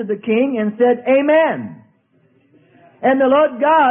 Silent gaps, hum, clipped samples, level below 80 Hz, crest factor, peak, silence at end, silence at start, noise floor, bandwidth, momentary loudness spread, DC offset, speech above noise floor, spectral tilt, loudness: none; none; under 0.1%; -64 dBFS; 14 dB; -2 dBFS; 0 s; 0 s; -57 dBFS; 3.7 kHz; 7 LU; under 0.1%; 43 dB; -11 dB/octave; -15 LUFS